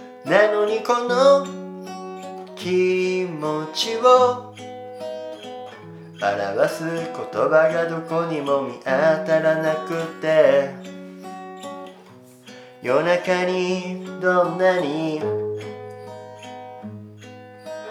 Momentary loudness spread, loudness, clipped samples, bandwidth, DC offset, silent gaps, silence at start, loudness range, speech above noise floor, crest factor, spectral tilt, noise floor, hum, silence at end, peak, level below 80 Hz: 21 LU; -20 LUFS; under 0.1%; 14.5 kHz; under 0.1%; none; 0 s; 5 LU; 27 dB; 20 dB; -5 dB/octave; -46 dBFS; none; 0 s; -2 dBFS; -80 dBFS